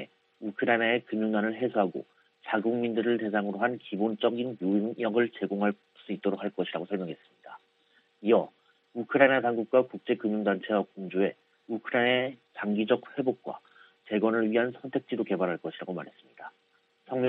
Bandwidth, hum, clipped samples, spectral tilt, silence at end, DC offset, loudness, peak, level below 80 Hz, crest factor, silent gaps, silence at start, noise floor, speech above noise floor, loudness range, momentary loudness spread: 4.3 kHz; none; under 0.1%; -9 dB/octave; 0 s; under 0.1%; -29 LUFS; -8 dBFS; -78 dBFS; 22 dB; none; 0 s; -70 dBFS; 41 dB; 4 LU; 14 LU